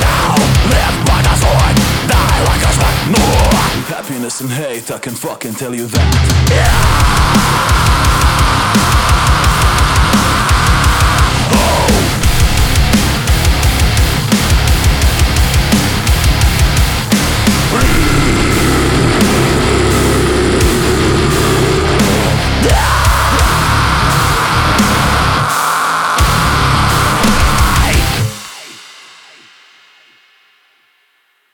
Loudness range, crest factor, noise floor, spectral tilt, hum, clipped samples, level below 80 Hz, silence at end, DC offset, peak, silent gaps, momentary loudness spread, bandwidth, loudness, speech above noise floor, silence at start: 4 LU; 10 dB; -57 dBFS; -4.5 dB/octave; none; under 0.1%; -16 dBFS; 2.6 s; under 0.1%; 0 dBFS; none; 3 LU; over 20 kHz; -11 LUFS; 45 dB; 0 s